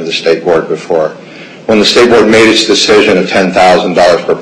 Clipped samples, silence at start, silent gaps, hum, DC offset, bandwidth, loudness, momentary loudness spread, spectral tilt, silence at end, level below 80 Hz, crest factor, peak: 0.3%; 0 s; none; none; under 0.1%; 12.5 kHz; -7 LUFS; 8 LU; -3.5 dB/octave; 0 s; -40 dBFS; 8 dB; 0 dBFS